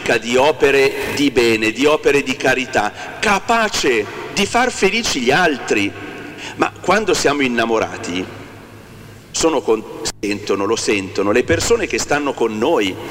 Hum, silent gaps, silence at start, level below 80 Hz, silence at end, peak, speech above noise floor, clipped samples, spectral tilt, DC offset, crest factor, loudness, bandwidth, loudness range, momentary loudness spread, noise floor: none; none; 0 s; -42 dBFS; 0 s; 0 dBFS; 22 dB; under 0.1%; -3.5 dB/octave; under 0.1%; 16 dB; -16 LUFS; 16 kHz; 5 LU; 9 LU; -38 dBFS